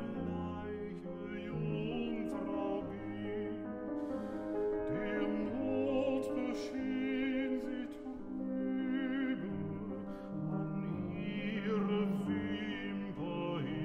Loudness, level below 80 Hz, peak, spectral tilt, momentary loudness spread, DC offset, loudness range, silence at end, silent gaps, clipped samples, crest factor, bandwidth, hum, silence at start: -38 LUFS; -60 dBFS; -22 dBFS; -8 dB/octave; 8 LU; under 0.1%; 3 LU; 0 s; none; under 0.1%; 14 dB; 10 kHz; none; 0 s